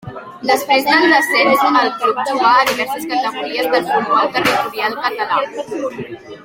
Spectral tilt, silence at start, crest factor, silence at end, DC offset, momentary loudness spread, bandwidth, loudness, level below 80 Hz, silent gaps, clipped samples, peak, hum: -3 dB/octave; 0.05 s; 14 dB; 0 s; under 0.1%; 12 LU; 16.5 kHz; -15 LUFS; -58 dBFS; none; under 0.1%; 0 dBFS; none